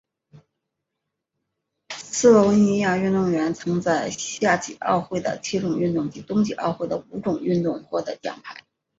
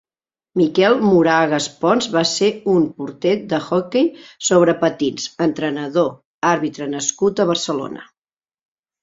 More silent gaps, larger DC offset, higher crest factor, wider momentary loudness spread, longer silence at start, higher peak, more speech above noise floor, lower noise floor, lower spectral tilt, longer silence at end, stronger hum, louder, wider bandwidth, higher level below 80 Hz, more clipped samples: second, none vs 6.25-6.41 s; neither; about the same, 20 dB vs 16 dB; first, 12 LU vs 9 LU; first, 1.9 s vs 0.55 s; about the same, -4 dBFS vs -2 dBFS; second, 60 dB vs over 73 dB; second, -82 dBFS vs under -90 dBFS; about the same, -5.5 dB/octave vs -4.5 dB/octave; second, 0.4 s vs 1 s; neither; second, -22 LUFS vs -18 LUFS; about the same, 8 kHz vs 8 kHz; about the same, -60 dBFS vs -60 dBFS; neither